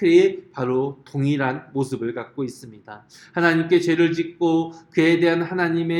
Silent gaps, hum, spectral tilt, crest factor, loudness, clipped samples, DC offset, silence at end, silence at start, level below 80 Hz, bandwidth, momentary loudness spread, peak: none; none; -6.5 dB/octave; 18 dB; -21 LUFS; under 0.1%; under 0.1%; 0 s; 0 s; -66 dBFS; 11 kHz; 13 LU; -4 dBFS